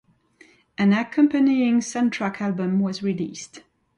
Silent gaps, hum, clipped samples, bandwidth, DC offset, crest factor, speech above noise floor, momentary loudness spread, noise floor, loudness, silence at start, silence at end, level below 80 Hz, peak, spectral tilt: none; none; under 0.1%; 11 kHz; under 0.1%; 16 dB; 34 dB; 13 LU; -55 dBFS; -22 LUFS; 0.8 s; 0.4 s; -66 dBFS; -6 dBFS; -6 dB/octave